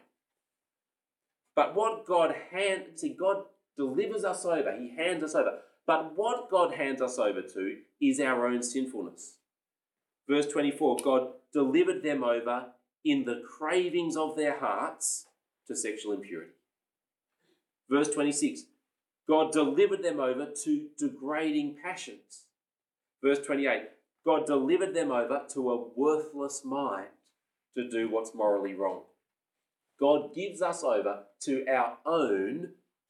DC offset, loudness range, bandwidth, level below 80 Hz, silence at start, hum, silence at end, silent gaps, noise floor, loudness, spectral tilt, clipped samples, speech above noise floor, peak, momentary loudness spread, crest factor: under 0.1%; 4 LU; 12.5 kHz; under -90 dBFS; 1.55 s; none; 0.35 s; none; under -90 dBFS; -30 LUFS; -3.5 dB/octave; under 0.1%; over 61 dB; -12 dBFS; 11 LU; 20 dB